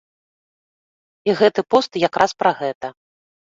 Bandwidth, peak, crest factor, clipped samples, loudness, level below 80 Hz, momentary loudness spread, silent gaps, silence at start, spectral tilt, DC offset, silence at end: 7.8 kHz; -2 dBFS; 20 dB; under 0.1%; -19 LUFS; -60 dBFS; 10 LU; 2.75-2.81 s; 1.25 s; -4.5 dB/octave; under 0.1%; 0.65 s